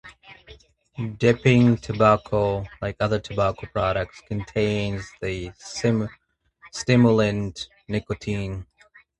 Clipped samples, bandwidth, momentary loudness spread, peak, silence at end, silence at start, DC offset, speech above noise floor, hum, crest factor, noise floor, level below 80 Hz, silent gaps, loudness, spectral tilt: under 0.1%; 10.5 kHz; 15 LU; -2 dBFS; 0.55 s; 0.05 s; under 0.1%; 31 dB; none; 20 dB; -54 dBFS; -46 dBFS; none; -23 LUFS; -6.5 dB/octave